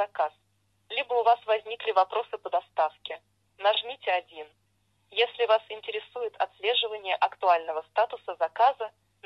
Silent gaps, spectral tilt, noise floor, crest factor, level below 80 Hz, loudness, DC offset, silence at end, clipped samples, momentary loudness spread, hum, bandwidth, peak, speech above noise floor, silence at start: none; -2.5 dB/octave; -71 dBFS; 18 dB; -80 dBFS; -28 LUFS; under 0.1%; 0.4 s; under 0.1%; 11 LU; none; 6 kHz; -10 dBFS; 43 dB; 0 s